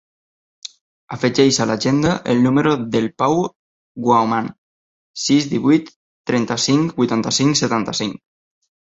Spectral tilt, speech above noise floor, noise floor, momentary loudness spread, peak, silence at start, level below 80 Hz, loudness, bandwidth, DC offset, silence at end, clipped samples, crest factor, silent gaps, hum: -4.5 dB/octave; over 73 dB; under -90 dBFS; 16 LU; -2 dBFS; 0.65 s; -54 dBFS; -18 LUFS; 8 kHz; under 0.1%; 0.75 s; under 0.1%; 16 dB; 0.81-1.08 s, 3.56-3.95 s, 4.58-5.14 s, 5.96-6.24 s; none